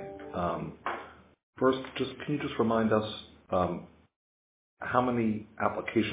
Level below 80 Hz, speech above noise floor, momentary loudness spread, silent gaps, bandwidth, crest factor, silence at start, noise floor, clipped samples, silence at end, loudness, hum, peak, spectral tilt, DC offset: -58 dBFS; over 60 dB; 12 LU; 1.43-1.53 s, 4.16-4.77 s; 4 kHz; 22 dB; 0 s; under -90 dBFS; under 0.1%; 0 s; -31 LUFS; none; -10 dBFS; -5 dB/octave; under 0.1%